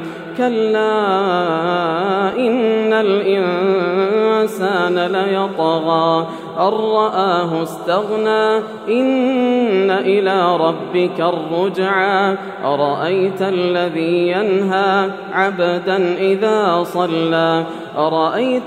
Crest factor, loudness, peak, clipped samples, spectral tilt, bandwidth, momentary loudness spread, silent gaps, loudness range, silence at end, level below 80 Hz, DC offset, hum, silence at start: 16 dB; -16 LUFS; 0 dBFS; under 0.1%; -6.5 dB/octave; 15 kHz; 4 LU; none; 1 LU; 0 s; -70 dBFS; under 0.1%; none; 0 s